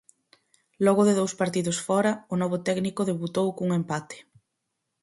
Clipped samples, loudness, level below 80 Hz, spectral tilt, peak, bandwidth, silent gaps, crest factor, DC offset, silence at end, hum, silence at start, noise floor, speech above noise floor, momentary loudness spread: under 0.1%; -26 LUFS; -68 dBFS; -5.5 dB/octave; -8 dBFS; 11.5 kHz; none; 18 dB; under 0.1%; 0.8 s; none; 0.8 s; -81 dBFS; 56 dB; 9 LU